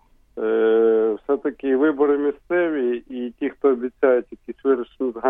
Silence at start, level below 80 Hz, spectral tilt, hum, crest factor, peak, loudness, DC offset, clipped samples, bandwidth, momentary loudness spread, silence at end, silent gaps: 0.35 s; -58 dBFS; -8.5 dB/octave; none; 16 dB; -6 dBFS; -21 LUFS; under 0.1%; under 0.1%; 3.7 kHz; 10 LU; 0 s; none